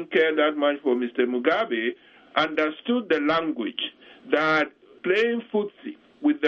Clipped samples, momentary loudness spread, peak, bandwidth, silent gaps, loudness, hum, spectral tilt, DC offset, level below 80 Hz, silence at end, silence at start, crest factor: under 0.1%; 10 LU; -6 dBFS; 7 kHz; none; -24 LUFS; none; -5.5 dB/octave; under 0.1%; -70 dBFS; 0 s; 0 s; 18 dB